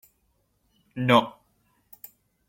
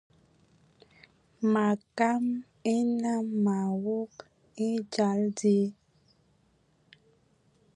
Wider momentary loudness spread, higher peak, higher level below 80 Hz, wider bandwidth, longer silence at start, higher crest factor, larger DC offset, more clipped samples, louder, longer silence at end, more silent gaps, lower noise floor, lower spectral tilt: first, 25 LU vs 8 LU; first, -4 dBFS vs -12 dBFS; first, -64 dBFS vs -76 dBFS; first, 16.5 kHz vs 10.5 kHz; second, 0.95 s vs 1.4 s; first, 24 dB vs 18 dB; neither; neither; first, -22 LUFS vs -29 LUFS; second, 1.2 s vs 2.05 s; neither; about the same, -70 dBFS vs -68 dBFS; about the same, -6 dB/octave vs -6.5 dB/octave